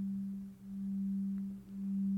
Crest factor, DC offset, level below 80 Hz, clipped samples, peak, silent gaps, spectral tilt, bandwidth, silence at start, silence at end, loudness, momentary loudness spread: 8 dB; under 0.1%; -68 dBFS; under 0.1%; -30 dBFS; none; -10 dB/octave; 2.1 kHz; 0 s; 0 s; -40 LUFS; 8 LU